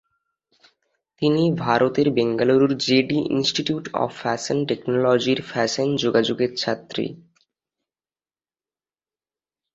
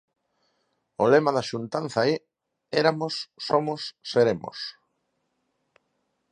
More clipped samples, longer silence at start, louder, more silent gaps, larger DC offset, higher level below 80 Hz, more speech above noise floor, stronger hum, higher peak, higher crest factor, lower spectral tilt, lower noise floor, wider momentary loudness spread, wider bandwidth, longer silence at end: neither; first, 1.2 s vs 1 s; first, -21 LUFS vs -25 LUFS; neither; neither; first, -62 dBFS vs -68 dBFS; first, over 69 dB vs 51 dB; neither; about the same, -4 dBFS vs -2 dBFS; about the same, 20 dB vs 24 dB; about the same, -5 dB/octave vs -5.5 dB/octave; first, under -90 dBFS vs -75 dBFS; second, 7 LU vs 13 LU; second, 8.2 kHz vs 10 kHz; first, 2.6 s vs 1.6 s